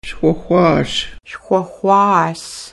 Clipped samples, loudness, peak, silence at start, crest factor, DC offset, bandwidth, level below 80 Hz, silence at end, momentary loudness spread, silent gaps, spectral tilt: under 0.1%; -15 LUFS; 0 dBFS; 0.05 s; 16 dB; under 0.1%; 12 kHz; -42 dBFS; 0.05 s; 14 LU; none; -5.5 dB/octave